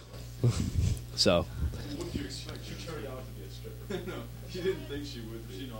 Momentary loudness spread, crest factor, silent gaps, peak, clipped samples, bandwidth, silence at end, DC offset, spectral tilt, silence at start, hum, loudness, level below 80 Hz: 16 LU; 22 dB; none; -12 dBFS; under 0.1%; 16.5 kHz; 0 s; under 0.1%; -5 dB/octave; 0 s; 60 Hz at -45 dBFS; -34 LUFS; -42 dBFS